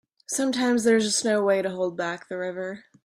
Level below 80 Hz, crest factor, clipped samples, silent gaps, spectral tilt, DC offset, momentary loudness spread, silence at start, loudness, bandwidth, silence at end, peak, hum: -70 dBFS; 16 dB; under 0.1%; none; -3.5 dB/octave; under 0.1%; 11 LU; 0.3 s; -24 LUFS; 15 kHz; 0.25 s; -10 dBFS; none